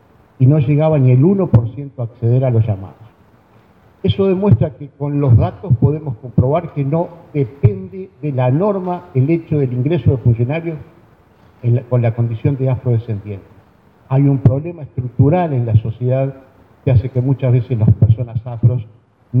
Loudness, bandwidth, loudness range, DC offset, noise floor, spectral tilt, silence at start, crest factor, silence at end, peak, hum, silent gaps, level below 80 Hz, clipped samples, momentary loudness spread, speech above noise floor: -16 LUFS; 3.8 kHz; 2 LU; under 0.1%; -49 dBFS; -12 dB/octave; 0.4 s; 14 dB; 0 s; 0 dBFS; none; none; -40 dBFS; under 0.1%; 12 LU; 34 dB